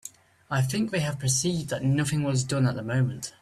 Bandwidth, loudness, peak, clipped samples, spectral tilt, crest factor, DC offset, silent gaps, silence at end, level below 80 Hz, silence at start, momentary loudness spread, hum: 14 kHz; -26 LUFS; -12 dBFS; under 0.1%; -5 dB/octave; 14 dB; under 0.1%; none; 0.1 s; -56 dBFS; 0.05 s; 3 LU; none